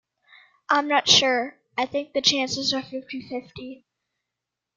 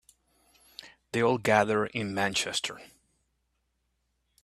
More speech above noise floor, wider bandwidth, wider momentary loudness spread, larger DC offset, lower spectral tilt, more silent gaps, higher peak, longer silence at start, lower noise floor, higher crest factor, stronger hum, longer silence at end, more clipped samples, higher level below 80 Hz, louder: first, 61 dB vs 49 dB; second, 13 kHz vs 14.5 kHz; second, 18 LU vs 23 LU; neither; second, -1.5 dB/octave vs -3.5 dB/octave; neither; first, -4 dBFS vs -8 dBFS; second, 0.7 s vs 0.85 s; first, -85 dBFS vs -77 dBFS; about the same, 22 dB vs 24 dB; neither; second, 1.05 s vs 1.55 s; neither; about the same, -66 dBFS vs -68 dBFS; first, -21 LUFS vs -28 LUFS